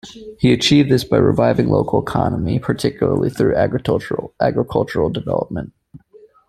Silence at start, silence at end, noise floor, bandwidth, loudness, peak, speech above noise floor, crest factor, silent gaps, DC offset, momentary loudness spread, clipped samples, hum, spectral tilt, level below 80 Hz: 0.05 s; 0.5 s; -48 dBFS; 14 kHz; -17 LUFS; -2 dBFS; 31 dB; 16 dB; none; under 0.1%; 8 LU; under 0.1%; none; -6.5 dB/octave; -42 dBFS